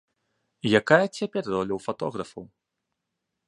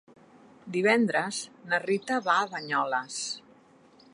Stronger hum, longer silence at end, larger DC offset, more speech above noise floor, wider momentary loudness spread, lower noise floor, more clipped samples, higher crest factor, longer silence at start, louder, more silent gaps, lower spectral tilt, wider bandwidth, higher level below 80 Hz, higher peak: neither; first, 1.05 s vs 0.75 s; neither; first, 57 dB vs 30 dB; first, 17 LU vs 11 LU; first, -82 dBFS vs -58 dBFS; neither; about the same, 24 dB vs 22 dB; about the same, 0.65 s vs 0.65 s; first, -25 LUFS vs -28 LUFS; neither; first, -5.5 dB/octave vs -3.5 dB/octave; about the same, 11.5 kHz vs 11.5 kHz; first, -64 dBFS vs -82 dBFS; first, -2 dBFS vs -8 dBFS